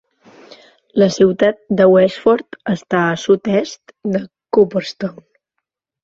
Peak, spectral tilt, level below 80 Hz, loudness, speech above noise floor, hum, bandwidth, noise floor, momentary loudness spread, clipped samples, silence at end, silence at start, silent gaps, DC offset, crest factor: 0 dBFS; -6 dB/octave; -56 dBFS; -16 LUFS; 62 dB; none; 7.8 kHz; -77 dBFS; 12 LU; under 0.1%; 0.95 s; 0.95 s; none; under 0.1%; 16 dB